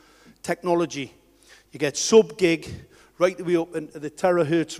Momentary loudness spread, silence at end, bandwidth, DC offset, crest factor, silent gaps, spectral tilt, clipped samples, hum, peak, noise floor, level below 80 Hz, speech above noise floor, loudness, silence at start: 18 LU; 0 s; 14.5 kHz; under 0.1%; 20 dB; none; -4.5 dB/octave; under 0.1%; none; -4 dBFS; -54 dBFS; -60 dBFS; 32 dB; -23 LUFS; 0.45 s